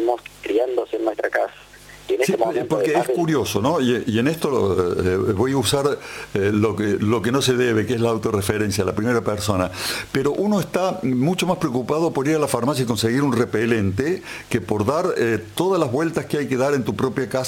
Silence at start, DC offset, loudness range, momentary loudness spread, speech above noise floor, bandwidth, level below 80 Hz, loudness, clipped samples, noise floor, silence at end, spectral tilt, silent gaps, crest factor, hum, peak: 0 s; under 0.1%; 2 LU; 4 LU; 23 dB; 17 kHz; -50 dBFS; -21 LUFS; under 0.1%; -43 dBFS; 0 s; -5.5 dB/octave; none; 16 dB; 50 Hz at -50 dBFS; -4 dBFS